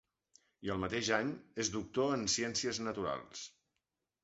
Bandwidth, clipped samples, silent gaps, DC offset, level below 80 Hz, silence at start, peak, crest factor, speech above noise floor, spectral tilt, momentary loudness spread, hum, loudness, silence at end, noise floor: 8 kHz; under 0.1%; none; under 0.1%; -64 dBFS; 0.6 s; -16 dBFS; 22 dB; 51 dB; -3 dB/octave; 12 LU; none; -36 LUFS; 0.75 s; -88 dBFS